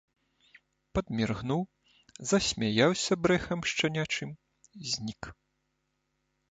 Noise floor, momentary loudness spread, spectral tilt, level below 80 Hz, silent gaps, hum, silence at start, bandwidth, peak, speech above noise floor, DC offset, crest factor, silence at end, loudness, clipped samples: -79 dBFS; 16 LU; -4 dB/octave; -54 dBFS; none; none; 0.95 s; 9.4 kHz; -10 dBFS; 49 dB; under 0.1%; 22 dB; 1.2 s; -30 LUFS; under 0.1%